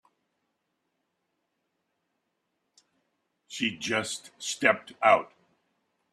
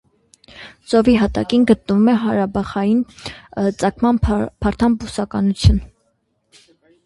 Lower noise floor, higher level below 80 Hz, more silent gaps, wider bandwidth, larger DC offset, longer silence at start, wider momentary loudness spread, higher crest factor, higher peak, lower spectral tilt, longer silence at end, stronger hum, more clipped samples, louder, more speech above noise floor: first, -79 dBFS vs -66 dBFS; second, -76 dBFS vs -30 dBFS; neither; first, 13.5 kHz vs 11.5 kHz; neither; first, 3.5 s vs 0.55 s; about the same, 13 LU vs 12 LU; first, 26 dB vs 18 dB; second, -8 dBFS vs 0 dBFS; second, -2.5 dB/octave vs -7 dB/octave; second, 0.9 s vs 1.2 s; neither; neither; second, -27 LUFS vs -17 LUFS; first, 53 dB vs 49 dB